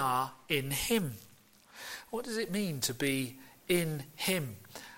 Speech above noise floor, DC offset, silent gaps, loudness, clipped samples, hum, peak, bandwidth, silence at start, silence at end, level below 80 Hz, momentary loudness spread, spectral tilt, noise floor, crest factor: 25 dB; under 0.1%; none; -34 LUFS; under 0.1%; none; -14 dBFS; 17 kHz; 0 s; 0 s; -62 dBFS; 13 LU; -4 dB/octave; -59 dBFS; 20 dB